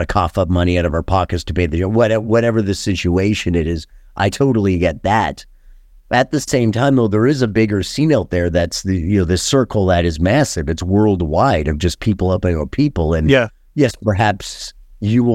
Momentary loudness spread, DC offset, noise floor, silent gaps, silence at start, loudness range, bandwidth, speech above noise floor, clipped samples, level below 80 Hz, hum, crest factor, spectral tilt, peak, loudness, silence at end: 5 LU; under 0.1%; -43 dBFS; none; 0 s; 2 LU; 15.5 kHz; 28 dB; under 0.1%; -32 dBFS; none; 16 dB; -6 dB/octave; 0 dBFS; -16 LUFS; 0 s